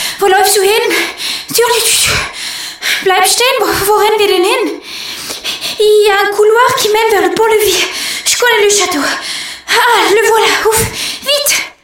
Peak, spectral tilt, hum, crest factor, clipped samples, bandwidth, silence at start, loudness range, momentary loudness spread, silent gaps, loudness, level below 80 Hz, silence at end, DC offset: 0 dBFS; -1 dB/octave; none; 10 dB; under 0.1%; 17 kHz; 0 s; 2 LU; 10 LU; none; -10 LUFS; -42 dBFS; 0.1 s; under 0.1%